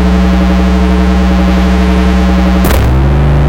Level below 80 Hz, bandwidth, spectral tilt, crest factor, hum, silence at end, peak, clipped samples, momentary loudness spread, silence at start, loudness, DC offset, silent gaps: -10 dBFS; 17 kHz; -7 dB/octave; 6 dB; none; 0 s; -2 dBFS; under 0.1%; 0 LU; 0 s; -9 LUFS; 1%; none